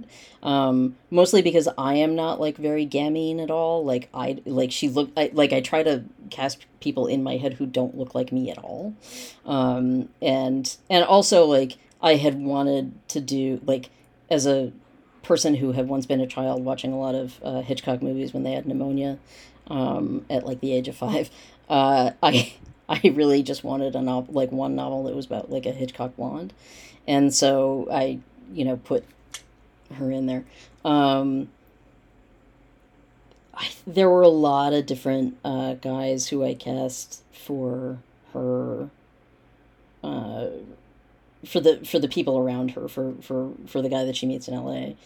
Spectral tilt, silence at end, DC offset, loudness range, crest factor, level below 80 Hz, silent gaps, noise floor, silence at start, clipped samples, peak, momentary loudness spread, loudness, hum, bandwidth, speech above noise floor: -5 dB/octave; 0.1 s; under 0.1%; 7 LU; 22 dB; -60 dBFS; none; -57 dBFS; 0 s; under 0.1%; -2 dBFS; 14 LU; -24 LUFS; none; 19 kHz; 34 dB